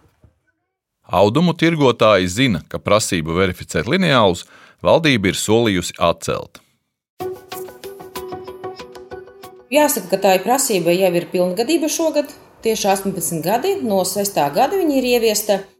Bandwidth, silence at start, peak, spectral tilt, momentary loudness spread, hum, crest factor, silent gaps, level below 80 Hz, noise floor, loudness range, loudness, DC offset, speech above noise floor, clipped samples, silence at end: 17 kHz; 1.1 s; 0 dBFS; -4.5 dB/octave; 17 LU; none; 18 dB; 7.10-7.17 s; -48 dBFS; -75 dBFS; 8 LU; -17 LUFS; under 0.1%; 58 dB; under 0.1%; 0.15 s